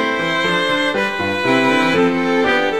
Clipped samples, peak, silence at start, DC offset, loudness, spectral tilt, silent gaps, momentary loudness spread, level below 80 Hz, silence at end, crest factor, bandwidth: under 0.1%; -2 dBFS; 0 s; 0.7%; -16 LUFS; -4.5 dB/octave; none; 4 LU; -52 dBFS; 0 s; 14 dB; 15 kHz